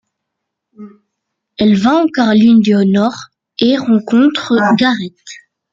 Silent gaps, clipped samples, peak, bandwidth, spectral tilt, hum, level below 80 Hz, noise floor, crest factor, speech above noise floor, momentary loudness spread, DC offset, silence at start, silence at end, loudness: none; under 0.1%; 0 dBFS; 7.6 kHz; -6.5 dB/octave; none; -54 dBFS; -76 dBFS; 12 dB; 65 dB; 13 LU; under 0.1%; 0.8 s; 0.35 s; -12 LUFS